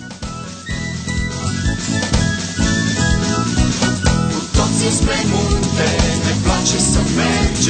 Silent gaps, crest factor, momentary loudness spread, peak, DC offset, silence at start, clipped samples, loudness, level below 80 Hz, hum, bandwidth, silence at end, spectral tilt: none; 14 dB; 8 LU; -2 dBFS; under 0.1%; 0 s; under 0.1%; -17 LUFS; -24 dBFS; none; 9.4 kHz; 0 s; -4 dB/octave